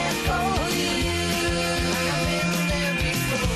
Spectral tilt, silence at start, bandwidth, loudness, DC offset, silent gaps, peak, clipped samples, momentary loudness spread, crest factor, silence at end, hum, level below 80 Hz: -4 dB/octave; 0 s; 14.5 kHz; -23 LUFS; under 0.1%; none; -12 dBFS; under 0.1%; 0 LU; 12 dB; 0 s; none; -34 dBFS